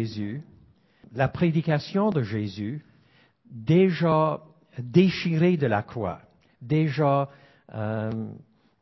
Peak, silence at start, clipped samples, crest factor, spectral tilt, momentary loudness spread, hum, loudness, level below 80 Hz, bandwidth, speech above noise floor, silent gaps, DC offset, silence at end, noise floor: -6 dBFS; 0 s; under 0.1%; 20 dB; -8.5 dB/octave; 18 LU; none; -25 LUFS; -56 dBFS; 6 kHz; 36 dB; none; under 0.1%; 0.45 s; -60 dBFS